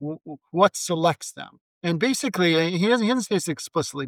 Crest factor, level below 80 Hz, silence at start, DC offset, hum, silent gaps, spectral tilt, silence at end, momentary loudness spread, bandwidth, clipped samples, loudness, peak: 18 dB; -70 dBFS; 0 s; under 0.1%; none; 1.61-1.81 s; -4.5 dB/octave; 0 s; 14 LU; 17.5 kHz; under 0.1%; -23 LUFS; -4 dBFS